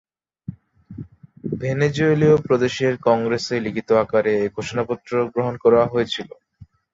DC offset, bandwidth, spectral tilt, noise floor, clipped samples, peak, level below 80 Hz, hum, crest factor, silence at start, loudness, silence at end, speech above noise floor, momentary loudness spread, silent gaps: under 0.1%; 7.8 kHz; -6.5 dB/octave; -49 dBFS; under 0.1%; -4 dBFS; -54 dBFS; none; 18 dB; 0.5 s; -20 LUFS; 0.3 s; 30 dB; 22 LU; none